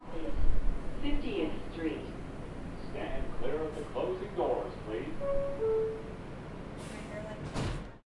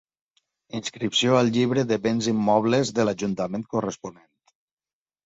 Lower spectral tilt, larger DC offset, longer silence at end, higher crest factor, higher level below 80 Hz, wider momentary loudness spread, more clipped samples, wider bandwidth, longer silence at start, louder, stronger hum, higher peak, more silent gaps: first, -7 dB/octave vs -5 dB/octave; neither; second, 0.05 s vs 1.15 s; about the same, 20 dB vs 20 dB; first, -38 dBFS vs -62 dBFS; about the same, 11 LU vs 12 LU; neither; first, 11 kHz vs 8 kHz; second, 0 s vs 0.75 s; second, -37 LUFS vs -23 LUFS; neither; second, -12 dBFS vs -6 dBFS; neither